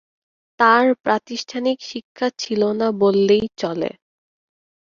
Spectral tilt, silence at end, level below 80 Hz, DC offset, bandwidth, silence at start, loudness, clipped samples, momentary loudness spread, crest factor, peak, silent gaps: -5 dB/octave; 0.95 s; -60 dBFS; under 0.1%; 7.4 kHz; 0.6 s; -19 LUFS; under 0.1%; 12 LU; 18 dB; -2 dBFS; 1.00-1.04 s, 2.04-2.15 s